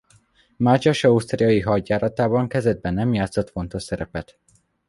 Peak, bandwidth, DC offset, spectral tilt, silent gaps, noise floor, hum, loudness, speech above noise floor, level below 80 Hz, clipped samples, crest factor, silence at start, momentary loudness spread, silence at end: -4 dBFS; 11.5 kHz; under 0.1%; -7 dB/octave; none; -58 dBFS; none; -21 LUFS; 37 dB; -44 dBFS; under 0.1%; 18 dB; 0.6 s; 11 LU; 0.65 s